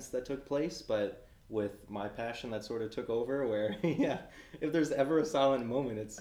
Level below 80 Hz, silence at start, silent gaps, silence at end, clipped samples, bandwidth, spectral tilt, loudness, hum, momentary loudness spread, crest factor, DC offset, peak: -62 dBFS; 0 s; none; 0 s; under 0.1%; 15.5 kHz; -5.5 dB/octave; -34 LUFS; none; 10 LU; 20 dB; under 0.1%; -14 dBFS